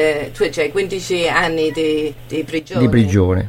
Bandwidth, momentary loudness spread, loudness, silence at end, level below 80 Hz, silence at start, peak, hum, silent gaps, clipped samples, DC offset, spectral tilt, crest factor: 16.5 kHz; 8 LU; -17 LUFS; 0 s; -38 dBFS; 0 s; 0 dBFS; none; none; under 0.1%; under 0.1%; -6 dB/octave; 16 dB